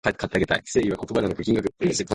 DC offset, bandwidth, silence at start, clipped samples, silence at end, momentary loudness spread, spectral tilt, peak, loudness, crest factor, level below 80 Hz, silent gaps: under 0.1%; 11.5 kHz; 0.05 s; under 0.1%; 0 s; 3 LU; -5 dB/octave; -6 dBFS; -24 LUFS; 18 dB; -46 dBFS; none